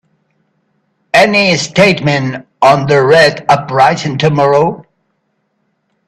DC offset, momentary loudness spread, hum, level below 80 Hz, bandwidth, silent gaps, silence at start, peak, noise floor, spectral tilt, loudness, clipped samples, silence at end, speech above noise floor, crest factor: under 0.1%; 6 LU; none; -50 dBFS; 14 kHz; none; 1.15 s; 0 dBFS; -64 dBFS; -5 dB/octave; -10 LUFS; under 0.1%; 1.25 s; 54 dB; 12 dB